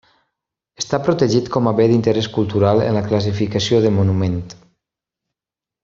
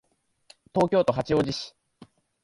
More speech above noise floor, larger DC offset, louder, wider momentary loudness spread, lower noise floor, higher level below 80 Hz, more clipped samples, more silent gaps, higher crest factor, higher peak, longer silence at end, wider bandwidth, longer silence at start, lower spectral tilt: first, 72 dB vs 35 dB; neither; first, -17 LUFS vs -25 LUFS; second, 8 LU vs 11 LU; first, -88 dBFS vs -59 dBFS; first, -50 dBFS vs -56 dBFS; neither; neither; about the same, 16 dB vs 18 dB; first, -2 dBFS vs -8 dBFS; first, 1.3 s vs 0.75 s; second, 7.6 kHz vs 11.5 kHz; about the same, 0.8 s vs 0.75 s; about the same, -6.5 dB/octave vs -6 dB/octave